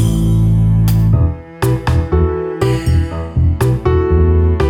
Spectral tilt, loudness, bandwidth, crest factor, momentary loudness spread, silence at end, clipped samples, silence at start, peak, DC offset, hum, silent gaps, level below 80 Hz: -8 dB/octave; -14 LUFS; 17 kHz; 12 dB; 5 LU; 0 s; under 0.1%; 0 s; -2 dBFS; under 0.1%; none; none; -20 dBFS